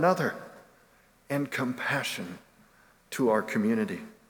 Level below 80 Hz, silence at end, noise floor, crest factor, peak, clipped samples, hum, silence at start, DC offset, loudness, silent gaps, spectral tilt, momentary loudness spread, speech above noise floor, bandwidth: -72 dBFS; 0.2 s; -62 dBFS; 20 dB; -10 dBFS; under 0.1%; none; 0 s; under 0.1%; -29 LUFS; none; -5.5 dB/octave; 16 LU; 33 dB; 19.5 kHz